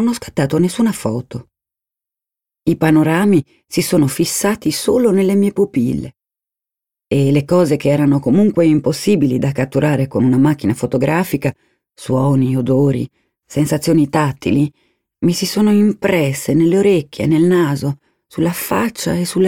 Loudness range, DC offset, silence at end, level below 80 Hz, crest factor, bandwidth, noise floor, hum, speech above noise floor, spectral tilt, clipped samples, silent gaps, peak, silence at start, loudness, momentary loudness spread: 3 LU; under 0.1%; 0 s; -48 dBFS; 14 dB; 17 kHz; -87 dBFS; none; 72 dB; -6.5 dB/octave; under 0.1%; none; -2 dBFS; 0 s; -15 LUFS; 9 LU